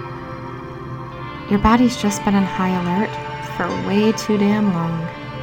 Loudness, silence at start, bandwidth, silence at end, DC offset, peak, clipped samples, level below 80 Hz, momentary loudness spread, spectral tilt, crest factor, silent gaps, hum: -19 LUFS; 0 s; 17 kHz; 0 s; under 0.1%; -2 dBFS; under 0.1%; -40 dBFS; 15 LU; -6 dB/octave; 18 dB; none; none